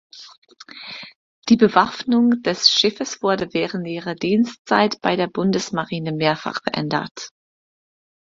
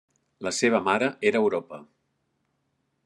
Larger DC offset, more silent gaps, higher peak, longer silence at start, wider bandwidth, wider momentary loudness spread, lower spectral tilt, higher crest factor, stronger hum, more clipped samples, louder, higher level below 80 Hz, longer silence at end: neither; first, 0.38-0.42 s, 1.15-1.42 s, 4.59-4.65 s, 7.11-7.15 s vs none; first, 0 dBFS vs -6 dBFS; second, 0.15 s vs 0.4 s; second, 7.6 kHz vs 11.5 kHz; first, 19 LU vs 16 LU; about the same, -4.5 dB/octave vs -4 dB/octave; about the same, 20 dB vs 20 dB; neither; neither; first, -19 LUFS vs -25 LUFS; first, -60 dBFS vs -78 dBFS; second, 1 s vs 1.25 s